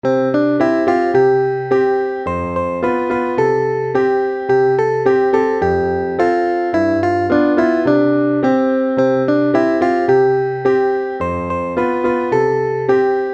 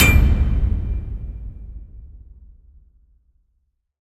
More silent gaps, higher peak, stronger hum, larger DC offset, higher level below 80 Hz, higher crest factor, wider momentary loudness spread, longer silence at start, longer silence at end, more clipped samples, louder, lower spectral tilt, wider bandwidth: neither; about the same, 0 dBFS vs -2 dBFS; neither; neither; second, -48 dBFS vs -24 dBFS; second, 14 dB vs 20 dB; second, 5 LU vs 24 LU; about the same, 0.05 s vs 0 s; second, 0 s vs 1.95 s; neither; first, -16 LUFS vs -21 LUFS; first, -8 dB/octave vs -4.5 dB/octave; second, 7.6 kHz vs 15.5 kHz